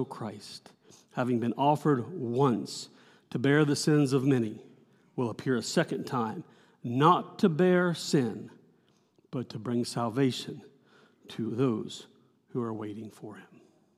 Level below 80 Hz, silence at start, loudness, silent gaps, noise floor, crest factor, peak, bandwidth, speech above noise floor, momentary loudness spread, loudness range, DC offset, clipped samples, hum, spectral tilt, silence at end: -82 dBFS; 0 s; -29 LUFS; none; -66 dBFS; 22 dB; -8 dBFS; 15 kHz; 38 dB; 19 LU; 7 LU; under 0.1%; under 0.1%; none; -6 dB/octave; 0.55 s